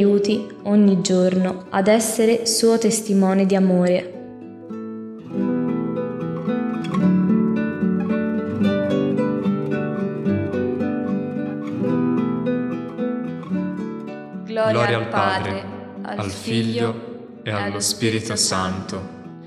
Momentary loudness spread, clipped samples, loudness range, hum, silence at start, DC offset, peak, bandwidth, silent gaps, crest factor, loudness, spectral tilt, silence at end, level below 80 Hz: 15 LU; under 0.1%; 6 LU; none; 0 s; under 0.1%; -4 dBFS; 14 kHz; none; 18 dB; -21 LUFS; -5 dB/octave; 0 s; -66 dBFS